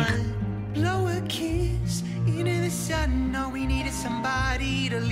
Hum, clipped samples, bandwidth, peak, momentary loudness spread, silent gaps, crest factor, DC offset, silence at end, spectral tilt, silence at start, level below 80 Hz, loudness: none; under 0.1%; 16 kHz; -10 dBFS; 3 LU; none; 16 dB; under 0.1%; 0 s; -5.5 dB/octave; 0 s; -34 dBFS; -27 LUFS